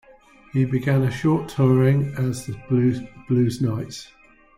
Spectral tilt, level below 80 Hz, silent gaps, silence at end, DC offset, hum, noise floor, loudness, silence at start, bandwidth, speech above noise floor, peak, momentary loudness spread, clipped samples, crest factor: -8 dB/octave; -50 dBFS; none; 0.55 s; under 0.1%; none; -51 dBFS; -22 LUFS; 0.55 s; 13 kHz; 30 dB; -8 dBFS; 13 LU; under 0.1%; 14 dB